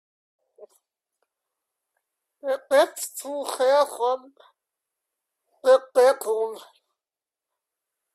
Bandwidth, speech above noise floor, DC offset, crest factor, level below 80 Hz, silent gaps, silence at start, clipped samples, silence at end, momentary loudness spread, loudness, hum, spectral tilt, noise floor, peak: 14.5 kHz; over 68 dB; under 0.1%; 20 dB; -80 dBFS; none; 0.6 s; under 0.1%; 1.55 s; 13 LU; -23 LUFS; none; -0.5 dB/octave; under -90 dBFS; -6 dBFS